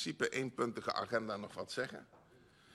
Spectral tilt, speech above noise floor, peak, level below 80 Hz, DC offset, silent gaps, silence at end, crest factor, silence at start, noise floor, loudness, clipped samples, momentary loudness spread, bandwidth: -4 dB/octave; 25 dB; -20 dBFS; -76 dBFS; under 0.1%; none; 0 s; 20 dB; 0 s; -65 dBFS; -39 LUFS; under 0.1%; 7 LU; 13 kHz